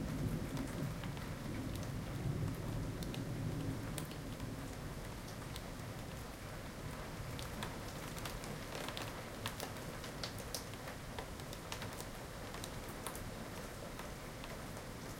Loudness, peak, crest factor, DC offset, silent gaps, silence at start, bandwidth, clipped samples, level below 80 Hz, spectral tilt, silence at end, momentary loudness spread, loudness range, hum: -45 LUFS; -22 dBFS; 22 dB; under 0.1%; none; 0 s; 17 kHz; under 0.1%; -54 dBFS; -5 dB/octave; 0 s; 6 LU; 4 LU; none